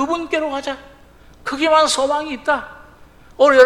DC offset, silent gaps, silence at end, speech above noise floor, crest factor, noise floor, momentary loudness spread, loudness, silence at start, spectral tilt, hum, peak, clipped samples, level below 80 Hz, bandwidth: under 0.1%; none; 0 s; 29 dB; 18 dB; -45 dBFS; 16 LU; -18 LUFS; 0 s; -2 dB/octave; none; 0 dBFS; 0.1%; -50 dBFS; 13.5 kHz